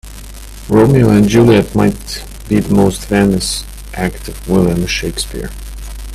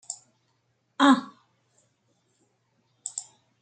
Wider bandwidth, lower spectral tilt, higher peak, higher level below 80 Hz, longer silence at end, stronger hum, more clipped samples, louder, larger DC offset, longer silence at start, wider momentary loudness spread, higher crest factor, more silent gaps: first, 15 kHz vs 9.4 kHz; first, -6 dB/octave vs -2.5 dB/octave; first, 0 dBFS vs -6 dBFS; first, -28 dBFS vs -84 dBFS; second, 0 s vs 0.4 s; first, 50 Hz at -30 dBFS vs none; neither; first, -13 LUFS vs -24 LUFS; neither; about the same, 0.05 s vs 0.1 s; second, 20 LU vs 24 LU; second, 14 dB vs 24 dB; neither